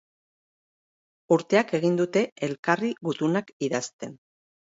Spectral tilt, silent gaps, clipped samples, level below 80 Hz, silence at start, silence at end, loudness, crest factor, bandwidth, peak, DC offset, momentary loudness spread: -5.5 dB/octave; 2.32-2.36 s, 2.59-2.63 s, 3.53-3.60 s, 3.93-3.99 s; under 0.1%; -74 dBFS; 1.3 s; 0.55 s; -25 LUFS; 22 dB; 8 kHz; -6 dBFS; under 0.1%; 9 LU